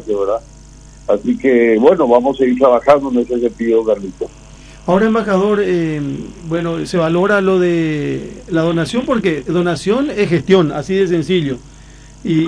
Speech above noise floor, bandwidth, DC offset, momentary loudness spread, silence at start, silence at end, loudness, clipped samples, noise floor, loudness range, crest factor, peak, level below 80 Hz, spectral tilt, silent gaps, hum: 24 dB; 10.5 kHz; under 0.1%; 11 LU; 0 s; 0 s; -15 LUFS; under 0.1%; -38 dBFS; 4 LU; 14 dB; 0 dBFS; -42 dBFS; -7 dB/octave; none; none